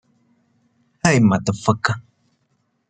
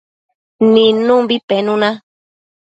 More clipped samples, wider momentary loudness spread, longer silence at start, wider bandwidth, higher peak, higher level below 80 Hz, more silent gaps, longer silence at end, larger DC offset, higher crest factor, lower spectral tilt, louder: neither; about the same, 8 LU vs 7 LU; first, 1.05 s vs 0.6 s; first, 9.4 kHz vs 8 kHz; about the same, -2 dBFS vs 0 dBFS; first, -54 dBFS vs -62 dBFS; second, none vs 1.43-1.48 s; first, 0.9 s vs 0.75 s; neither; first, 20 dB vs 14 dB; about the same, -5.5 dB/octave vs -6.5 dB/octave; second, -19 LUFS vs -13 LUFS